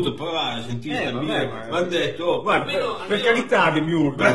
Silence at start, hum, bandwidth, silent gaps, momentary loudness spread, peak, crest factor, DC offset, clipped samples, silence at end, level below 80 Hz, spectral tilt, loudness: 0 s; none; 12 kHz; none; 7 LU; -4 dBFS; 18 dB; 0.8%; under 0.1%; 0 s; -52 dBFS; -5.5 dB/octave; -22 LUFS